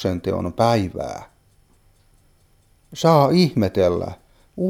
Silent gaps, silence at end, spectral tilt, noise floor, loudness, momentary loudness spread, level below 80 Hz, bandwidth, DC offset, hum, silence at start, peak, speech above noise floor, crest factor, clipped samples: none; 0 s; -7 dB/octave; -57 dBFS; -19 LUFS; 19 LU; -50 dBFS; 16 kHz; under 0.1%; none; 0 s; -2 dBFS; 39 dB; 20 dB; under 0.1%